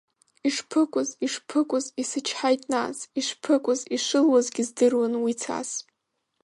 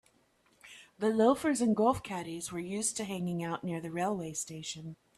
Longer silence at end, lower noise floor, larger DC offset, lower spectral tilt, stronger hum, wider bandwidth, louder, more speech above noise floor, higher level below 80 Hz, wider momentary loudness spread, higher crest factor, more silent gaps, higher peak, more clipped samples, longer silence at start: first, 0.6 s vs 0.25 s; first, -78 dBFS vs -69 dBFS; neither; second, -2.5 dB/octave vs -4.5 dB/octave; neither; second, 11.5 kHz vs 14 kHz; first, -25 LUFS vs -32 LUFS; first, 54 dB vs 37 dB; second, -76 dBFS vs -66 dBFS; second, 8 LU vs 14 LU; about the same, 16 dB vs 20 dB; neither; first, -10 dBFS vs -14 dBFS; neither; second, 0.45 s vs 0.65 s